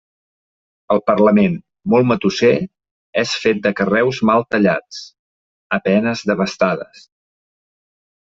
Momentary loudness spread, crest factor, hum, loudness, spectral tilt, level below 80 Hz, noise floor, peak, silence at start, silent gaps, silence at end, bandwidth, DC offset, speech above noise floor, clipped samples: 11 LU; 16 dB; none; -17 LUFS; -6 dB/octave; -56 dBFS; under -90 dBFS; -2 dBFS; 0.9 s; 2.91-3.13 s, 5.19-5.70 s; 1.4 s; 7.8 kHz; under 0.1%; over 74 dB; under 0.1%